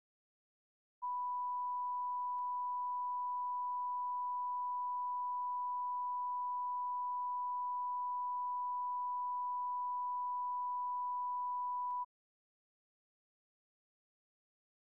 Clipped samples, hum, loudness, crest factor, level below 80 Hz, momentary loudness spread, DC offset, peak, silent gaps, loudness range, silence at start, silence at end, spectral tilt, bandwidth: under 0.1%; none; -39 LUFS; 4 dB; under -90 dBFS; 0 LU; under 0.1%; -36 dBFS; none; 3 LU; 1 s; 2.8 s; 3.5 dB/octave; 1.1 kHz